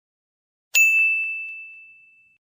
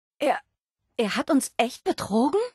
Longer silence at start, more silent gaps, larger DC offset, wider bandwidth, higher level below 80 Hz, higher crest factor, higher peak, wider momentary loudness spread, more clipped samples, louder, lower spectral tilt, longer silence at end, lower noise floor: first, 0.75 s vs 0.2 s; neither; neither; first, 16 kHz vs 12.5 kHz; second, -86 dBFS vs -64 dBFS; about the same, 20 dB vs 18 dB; about the same, -6 dBFS vs -8 dBFS; first, 18 LU vs 6 LU; neither; first, -17 LUFS vs -25 LUFS; second, 6 dB/octave vs -4 dB/octave; first, 0.7 s vs 0.05 s; second, -53 dBFS vs -78 dBFS